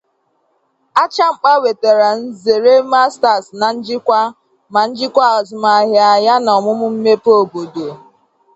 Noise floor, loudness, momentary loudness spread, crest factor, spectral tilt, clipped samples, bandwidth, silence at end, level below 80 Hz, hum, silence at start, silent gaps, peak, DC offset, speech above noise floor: -63 dBFS; -13 LUFS; 8 LU; 14 dB; -4 dB/octave; under 0.1%; 8.2 kHz; 0.6 s; -64 dBFS; none; 0.95 s; none; 0 dBFS; under 0.1%; 50 dB